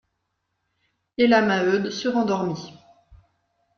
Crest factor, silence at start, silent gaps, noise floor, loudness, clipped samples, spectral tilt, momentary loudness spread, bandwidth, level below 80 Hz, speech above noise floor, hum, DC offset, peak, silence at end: 20 dB; 1.2 s; none; -77 dBFS; -21 LUFS; under 0.1%; -5.5 dB/octave; 17 LU; 7 kHz; -62 dBFS; 56 dB; none; under 0.1%; -6 dBFS; 0.6 s